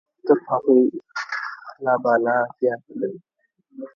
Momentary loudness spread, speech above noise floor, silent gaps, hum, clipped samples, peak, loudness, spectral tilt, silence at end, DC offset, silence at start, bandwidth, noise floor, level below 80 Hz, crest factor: 13 LU; 38 dB; none; none; under 0.1%; -2 dBFS; -22 LUFS; -6.5 dB/octave; 0.1 s; under 0.1%; 0.25 s; 7 kHz; -58 dBFS; -76 dBFS; 20 dB